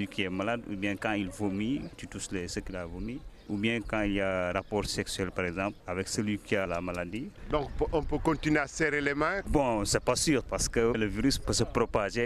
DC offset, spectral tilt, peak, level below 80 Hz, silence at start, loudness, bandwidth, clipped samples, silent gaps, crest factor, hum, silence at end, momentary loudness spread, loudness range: under 0.1%; -4.5 dB/octave; -14 dBFS; -44 dBFS; 0 s; -31 LUFS; 15 kHz; under 0.1%; none; 18 dB; none; 0 s; 9 LU; 5 LU